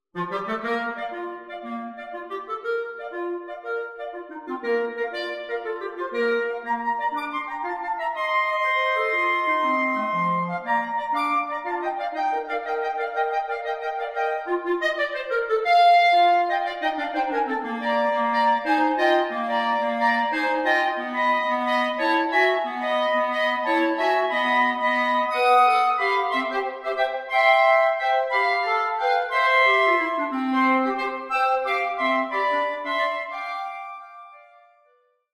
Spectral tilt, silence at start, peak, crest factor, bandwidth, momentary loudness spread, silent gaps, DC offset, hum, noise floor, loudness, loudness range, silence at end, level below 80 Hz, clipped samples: -4.5 dB/octave; 0.15 s; -6 dBFS; 16 dB; 15 kHz; 12 LU; none; under 0.1%; none; -64 dBFS; -23 LUFS; 9 LU; 0.95 s; -68 dBFS; under 0.1%